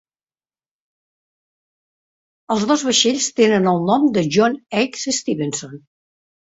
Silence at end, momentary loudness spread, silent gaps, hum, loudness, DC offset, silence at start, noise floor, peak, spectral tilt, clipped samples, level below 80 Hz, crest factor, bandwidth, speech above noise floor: 0.7 s; 8 LU; none; none; -17 LUFS; under 0.1%; 2.5 s; under -90 dBFS; -2 dBFS; -3.5 dB/octave; under 0.1%; -62 dBFS; 18 dB; 8 kHz; over 72 dB